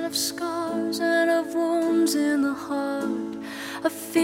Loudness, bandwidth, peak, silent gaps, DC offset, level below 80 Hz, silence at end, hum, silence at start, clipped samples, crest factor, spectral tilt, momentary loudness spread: -25 LUFS; 16 kHz; -8 dBFS; none; under 0.1%; -68 dBFS; 0 s; none; 0 s; under 0.1%; 16 dB; -3 dB/octave; 8 LU